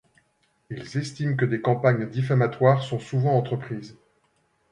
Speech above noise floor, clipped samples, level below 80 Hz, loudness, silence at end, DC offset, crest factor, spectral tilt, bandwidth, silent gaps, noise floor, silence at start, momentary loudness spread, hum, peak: 45 dB; under 0.1%; -62 dBFS; -24 LUFS; 0.8 s; under 0.1%; 20 dB; -7.5 dB/octave; 10 kHz; none; -68 dBFS; 0.7 s; 14 LU; none; -6 dBFS